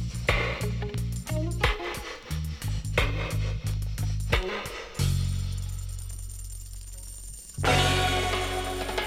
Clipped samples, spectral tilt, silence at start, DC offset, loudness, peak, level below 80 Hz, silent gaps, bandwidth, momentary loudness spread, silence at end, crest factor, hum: under 0.1%; -4.5 dB/octave; 0 s; under 0.1%; -29 LUFS; -8 dBFS; -34 dBFS; none; 16 kHz; 15 LU; 0 s; 20 dB; none